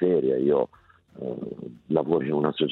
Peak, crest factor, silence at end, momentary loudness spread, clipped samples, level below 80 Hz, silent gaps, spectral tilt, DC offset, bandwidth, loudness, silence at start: -8 dBFS; 18 dB; 0 s; 14 LU; under 0.1%; -64 dBFS; none; -10 dB/octave; under 0.1%; 4.2 kHz; -25 LUFS; 0 s